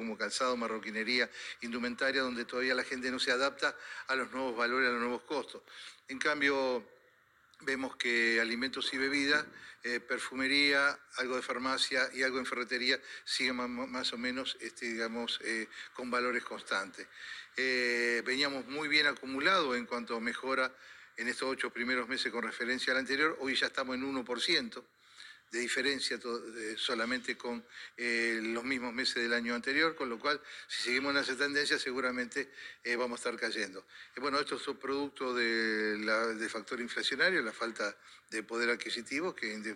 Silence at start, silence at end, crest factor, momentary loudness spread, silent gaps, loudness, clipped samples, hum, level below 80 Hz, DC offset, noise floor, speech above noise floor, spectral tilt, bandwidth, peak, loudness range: 0 s; 0 s; 20 dB; 10 LU; none; -33 LUFS; under 0.1%; none; -76 dBFS; under 0.1%; -67 dBFS; 32 dB; -2 dB/octave; 15 kHz; -14 dBFS; 4 LU